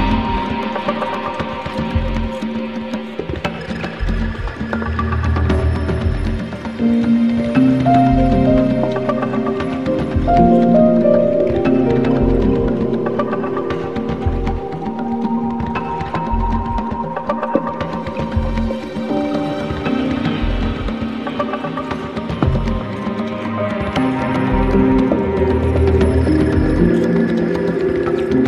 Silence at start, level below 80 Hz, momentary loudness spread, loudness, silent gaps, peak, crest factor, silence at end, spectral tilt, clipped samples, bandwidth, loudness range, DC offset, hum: 0 s; -26 dBFS; 9 LU; -18 LUFS; none; 0 dBFS; 16 dB; 0 s; -8.5 dB/octave; under 0.1%; 11 kHz; 7 LU; 0.6%; none